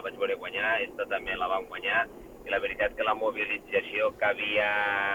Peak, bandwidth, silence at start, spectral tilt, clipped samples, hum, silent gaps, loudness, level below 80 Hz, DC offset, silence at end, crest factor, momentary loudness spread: -14 dBFS; 18 kHz; 0 s; -4 dB/octave; under 0.1%; none; none; -28 LUFS; -58 dBFS; under 0.1%; 0 s; 16 dB; 6 LU